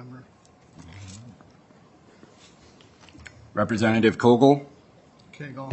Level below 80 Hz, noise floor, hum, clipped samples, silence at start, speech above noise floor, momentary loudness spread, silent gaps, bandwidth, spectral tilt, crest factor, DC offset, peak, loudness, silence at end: -64 dBFS; -55 dBFS; none; under 0.1%; 0 s; 35 dB; 27 LU; none; 8.6 kHz; -6.5 dB/octave; 24 dB; under 0.1%; -2 dBFS; -21 LUFS; 0 s